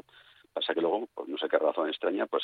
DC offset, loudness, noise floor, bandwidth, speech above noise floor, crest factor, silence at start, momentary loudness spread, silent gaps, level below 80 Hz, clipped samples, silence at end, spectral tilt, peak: under 0.1%; -30 LUFS; -59 dBFS; 4.9 kHz; 29 dB; 20 dB; 0.55 s; 8 LU; none; -82 dBFS; under 0.1%; 0 s; -6 dB/octave; -10 dBFS